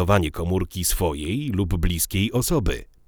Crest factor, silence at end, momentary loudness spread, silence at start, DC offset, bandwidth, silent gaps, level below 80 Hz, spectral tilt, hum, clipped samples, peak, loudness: 18 dB; 0.25 s; 4 LU; 0 s; under 0.1%; over 20 kHz; none; -30 dBFS; -5 dB/octave; none; under 0.1%; -4 dBFS; -23 LUFS